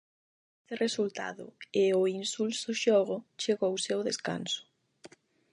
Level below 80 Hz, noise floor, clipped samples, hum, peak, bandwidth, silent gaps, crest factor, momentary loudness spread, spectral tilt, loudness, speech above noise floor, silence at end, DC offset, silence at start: -82 dBFS; -57 dBFS; under 0.1%; none; -14 dBFS; 11 kHz; none; 18 dB; 10 LU; -3.5 dB/octave; -31 LUFS; 26 dB; 0.45 s; under 0.1%; 0.7 s